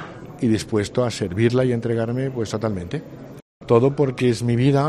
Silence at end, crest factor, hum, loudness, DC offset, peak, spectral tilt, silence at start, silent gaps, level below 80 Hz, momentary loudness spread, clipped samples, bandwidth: 0 s; 18 dB; none; -21 LUFS; under 0.1%; -2 dBFS; -7 dB/octave; 0 s; 3.42-3.60 s; -50 dBFS; 17 LU; under 0.1%; 12.5 kHz